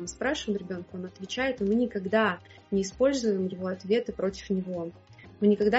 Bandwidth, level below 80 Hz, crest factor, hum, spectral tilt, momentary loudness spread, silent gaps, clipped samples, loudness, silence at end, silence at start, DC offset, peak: 8 kHz; -56 dBFS; 16 dB; none; -4.5 dB/octave; 11 LU; none; under 0.1%; -29 LUFS; 0 s; 0 s; under 0.1%; -12 dBFS